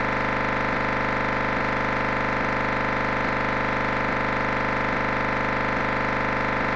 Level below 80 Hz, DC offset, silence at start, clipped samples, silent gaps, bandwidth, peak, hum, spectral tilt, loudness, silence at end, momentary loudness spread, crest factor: -38 dBFS; 0.7%; 0 s; under 0.1%; none; 9 kHz; -14 dBFS; 50 Hz at -35 dBFS; -6 dB/octave; -24 LUFS; 0 s; 0 LU; 10 dB